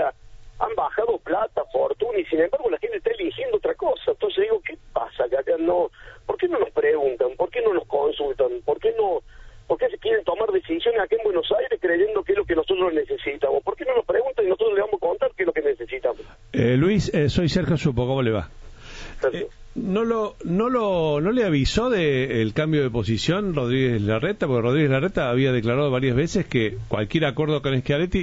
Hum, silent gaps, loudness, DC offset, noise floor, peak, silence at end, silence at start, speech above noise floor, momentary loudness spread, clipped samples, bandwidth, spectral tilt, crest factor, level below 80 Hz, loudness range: none; none; -23 LUFS; under 0.1%; -44 dBFS; -6 dBFS; 0 s; 0 s; 22 dB; 6 LU; under 0.1%; 8 kHz; -7 dB/octave; 16 dB; -44 dBFS; 3 LU